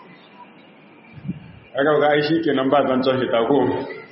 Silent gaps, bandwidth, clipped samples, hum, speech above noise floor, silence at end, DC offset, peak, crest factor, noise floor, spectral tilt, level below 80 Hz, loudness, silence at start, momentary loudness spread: none; 5.8 kHz; under 0.1%; none; 29 dB; 0.05 s; under 0.1%; -2 dBFS; 18 dB; -47 dBFS; -4 dB/octave; -60 dBFS; -19 LUFS; 0.4 s; 16 LU